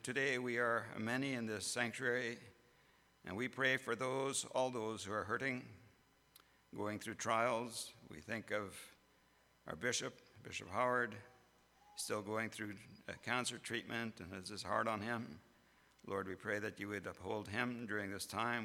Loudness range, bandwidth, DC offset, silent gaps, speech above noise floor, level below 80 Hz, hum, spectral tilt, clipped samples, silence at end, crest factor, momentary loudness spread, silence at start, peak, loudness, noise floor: 4 LU; 18.5 kHz; under 0.1%; none; 31 dB; -78 dBFS; none; -3.5 dB/octave; under 0.1%; 0 s; 22 dB; 15 LU; 0.05 s; -20 dBFS; -41 LUFS; -72 dBFS